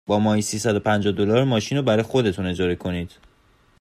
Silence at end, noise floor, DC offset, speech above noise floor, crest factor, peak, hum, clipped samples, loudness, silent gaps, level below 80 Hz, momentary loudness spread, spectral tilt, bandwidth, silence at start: 0.75 s; -58 dBFS; under 0.1%; 37 dB; 16 dB; -6 dBFS; none; under 0.1%; -21 LUFS; none; -54 dBFS; 7 LU; -5.5 dB/octave; 15 kHz; 0.1 s